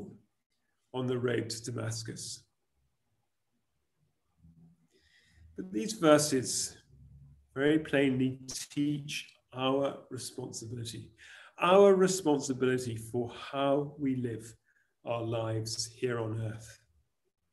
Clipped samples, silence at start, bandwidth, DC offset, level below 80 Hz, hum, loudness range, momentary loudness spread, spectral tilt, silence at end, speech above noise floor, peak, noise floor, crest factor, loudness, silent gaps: under 0.1%; 0 s; 13 kHz; under 0.1%; -68 dBFS; none; 10 LU; 19 LU; -4.5 dB/octave; 0.8 s; 52 dB; -8 dBFS; -83 dBFS; 24 dB; -31 LUFS; 0.46-0.50 s